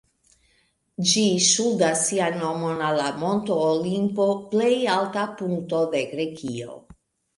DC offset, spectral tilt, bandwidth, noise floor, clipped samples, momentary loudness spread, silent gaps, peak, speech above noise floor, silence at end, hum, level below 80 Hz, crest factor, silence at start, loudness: under 0.1%; -3.5 dB/octave; 11.5 kHz; -66 dBFS; under 0.1%; 11 LU; none; -6 dBFS; 43 dB; 0.6 s; none; -64 dBFS; 18 dB; 1 s; -23 LUFS